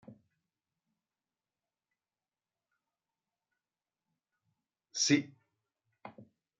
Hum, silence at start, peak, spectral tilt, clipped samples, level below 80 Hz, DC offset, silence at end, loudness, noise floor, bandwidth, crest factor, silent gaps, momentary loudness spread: none; 0.1 s; -14 dBFS; -3.5 dB/octave; under 0.1%; under -90 dBFS; under 0.1%; 0.4 s; -31 LUFS; under -90 dBFS; 7 kHz; 28 dB; none; 25 LU